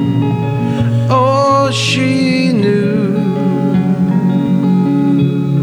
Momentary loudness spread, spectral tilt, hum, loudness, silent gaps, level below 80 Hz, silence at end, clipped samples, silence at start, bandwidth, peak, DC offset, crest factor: 3 LU; -7 dB/octave; none; -13 LUFS; none; -46 dBFS; 0 s; under 0.1%; 0 s; 11.5 kHz; -2 dBFS; under 0.1%; 10 dB